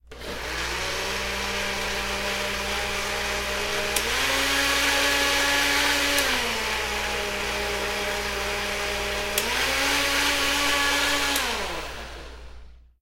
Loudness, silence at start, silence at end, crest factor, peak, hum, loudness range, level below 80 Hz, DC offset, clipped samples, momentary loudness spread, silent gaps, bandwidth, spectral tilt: -23 LUFS; 0.05 s; 0.25 s; 20 dB; -6 dBFS; none; 5 LU; -40 dBFS; under 0.1%; under 0.1%; 8 LU; none; 16 kHz; -1.5 dB/octave